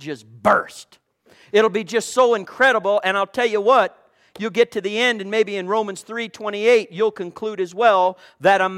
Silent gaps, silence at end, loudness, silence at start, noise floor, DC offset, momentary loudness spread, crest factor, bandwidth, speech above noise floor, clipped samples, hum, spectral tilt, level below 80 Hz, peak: none; 0 s; -19 LUFS; 0 s; -54 dBFS; under 0.1%; 11 LU; 18 dB; 14 kHz; 34 dB; under 0.1%; none; -3.5 dB/octave; -64 dBFS; -2 dBFS